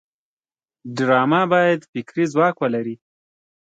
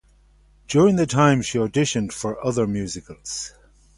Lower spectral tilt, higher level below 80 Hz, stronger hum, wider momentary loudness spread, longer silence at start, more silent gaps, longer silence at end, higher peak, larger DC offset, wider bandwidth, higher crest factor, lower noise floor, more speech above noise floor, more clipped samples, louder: about the same, -6.5 dB/octave vs -5.5 dB/octave; second, -70 dBFS vs -50 dBFS; second, none vs 50 Hz at -45 dBFS; about the same, 14 LU vs 14 LU; first, 0.85 s vs 0.7 s; first, 1.89-1.93 s vs none; first, 0.7 s vs 0.5 s; about the same, -4 dBFS vs -4 dBFS; neither; second, 9 kHz vs 11.5 kHz; about the same, 18 dB vs 18 dB; first, under -90 dBFS vs -55 dBFS; first, over 71 dB vs 34 dB; neither; about the same, -19 LUFS vs -21 LUFS